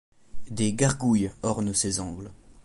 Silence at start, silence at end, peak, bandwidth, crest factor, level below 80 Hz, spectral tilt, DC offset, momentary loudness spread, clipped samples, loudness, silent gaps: 0.35 s; 0.05 s; -8 dBFS; 11.5 kHz; 20 dB; -48 dBFS; -4.5 dB/octave; under 0.1%; 15 LU; under 0.1%; -26 LUFS; none